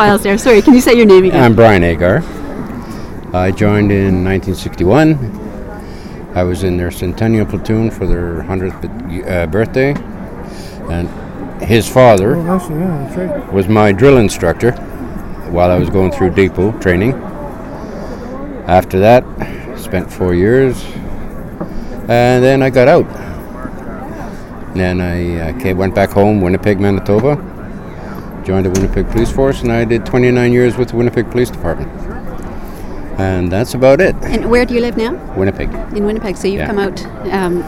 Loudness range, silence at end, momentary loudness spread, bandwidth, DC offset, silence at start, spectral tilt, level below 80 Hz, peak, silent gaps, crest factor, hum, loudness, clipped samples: 5 LU; 0 s; 18 LU; 16.5 kHz; under 0.1%; 0 s; -7 dB/octave; -28 dBFS; 0 dBFS; none; 12 dB; none; -12 LUFS; 0.3%